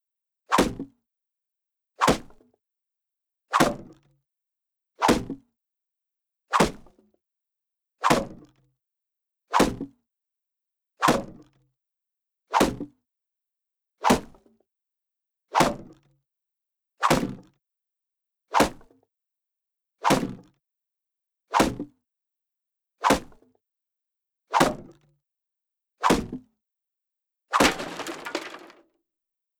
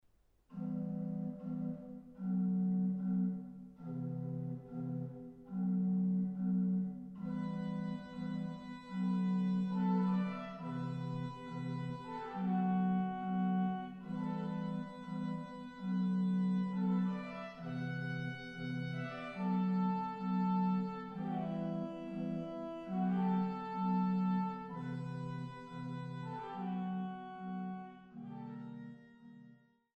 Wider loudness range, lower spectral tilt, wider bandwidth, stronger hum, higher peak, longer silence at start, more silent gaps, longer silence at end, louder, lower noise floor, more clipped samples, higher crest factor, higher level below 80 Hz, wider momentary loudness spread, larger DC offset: second, 1 LU vs 4 LU; second, -4 dB/octave vs -9.5 dB/octave; first, over 20 kHz vs 5.4 kHz; neither; first, -4 dBFS vs -24 dBFS; about the same, 0.5 s vs 0.5 s; neither; first, 1.05 s vs 0.4 s; first, -25 LUFS vs -38 LUFS; first, -87 dBFS vs -70 dBFS; neither; first, 26 dB vs 14 dB; first, -50 dBFS vs -72 dBFS; first, 17 LU vs 12 LU; neither